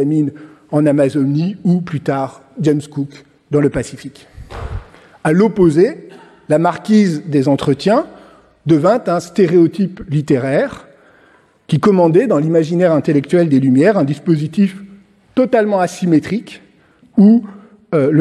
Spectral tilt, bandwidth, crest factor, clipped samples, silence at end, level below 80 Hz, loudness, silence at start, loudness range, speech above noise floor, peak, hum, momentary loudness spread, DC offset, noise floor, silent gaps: -8 dB/octave; 12 kHz; 14 dB; under 0.1%; 0 s; -44 dBFS; -14 LUFS; 0 s; 5 LU; 37 dB; -2 dBFS; none; 14 LU; under 0.1%; -50 dBFS; none